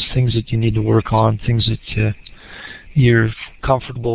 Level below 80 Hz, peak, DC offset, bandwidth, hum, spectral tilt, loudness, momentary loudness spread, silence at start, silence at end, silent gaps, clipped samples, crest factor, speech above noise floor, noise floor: -34 dBFS; 0 dBFS; under 0.1%; 4 kHz; none; -11 dB/octave; -17 LUFS; 19 LU; 0 s; 0 s; none; under 0.1%; 16 dB; 20 dB; -36 dBFS